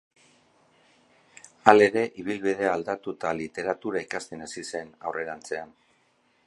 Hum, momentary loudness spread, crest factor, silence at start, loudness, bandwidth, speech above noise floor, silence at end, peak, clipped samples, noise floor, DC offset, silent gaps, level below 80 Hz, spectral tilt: none; 17 LU; 28 dB; 1.65 s; -26 LUFS; 11.5 kHz; 41 dB; 0.8 s; 0 dBFS; under 0.1%; -67 dBFS; under 0.1%; none; -68 dBFS; -4.5 dB/octave